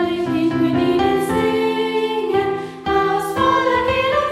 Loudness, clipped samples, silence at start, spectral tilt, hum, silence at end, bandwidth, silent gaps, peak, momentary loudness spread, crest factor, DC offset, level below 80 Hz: -18 LUFS; under 0.1%; 0 s; -5.5 dB/octave; none; 0 s; 15.5 kHz; none; -4 dBFS; 3 LU; 14 dB; under 0.1%; -44 dBFS